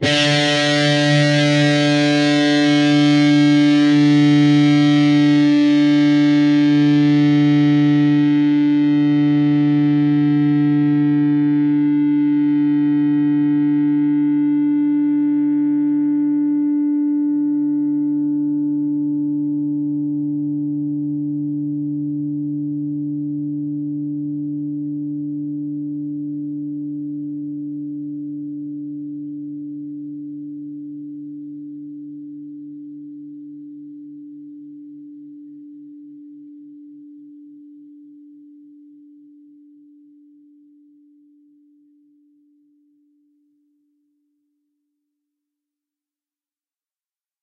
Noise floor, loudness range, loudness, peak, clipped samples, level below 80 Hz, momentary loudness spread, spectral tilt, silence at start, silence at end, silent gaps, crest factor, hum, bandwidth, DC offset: under -90 dBFS; 20 LU; -17 LUFS; -4 dBFS; under 0.1%; -66 dBFS; 20 LU; -6.5 dB/octave; 0 s; 9.85 s; none; 14 dB; none; 9.4 kHz; under 0.1%